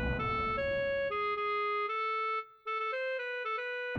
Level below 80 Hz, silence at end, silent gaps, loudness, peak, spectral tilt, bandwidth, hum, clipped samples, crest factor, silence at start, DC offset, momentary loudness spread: -50 dBFS; 0 s; none; -33 LUFS; -22 dBFS; -6.5 dB/octave; 7 kHz; none; under 0.1%; 12 dB; 0 s; under 0.1%; 3 LU